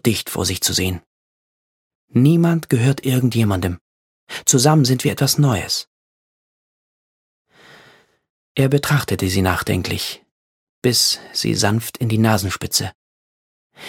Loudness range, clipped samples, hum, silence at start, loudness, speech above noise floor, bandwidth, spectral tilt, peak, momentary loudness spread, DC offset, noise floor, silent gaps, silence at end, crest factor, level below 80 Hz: 6 LU; under 0.1%; none; 0.05 s; -18 LUFS; 34 dB; 17.5 kHz; -4.5 dB/octave; 0 dBFS; 10 LU; under 0.1%; -52 dBFS; 1.06-2.08 s, 3.81-4.27 s, 5.87-7.45 s, 8.30-8.55 s, 10.31-10.82 s, 12.95-13.70 s; 0 s; 20 dB; -48 dBFS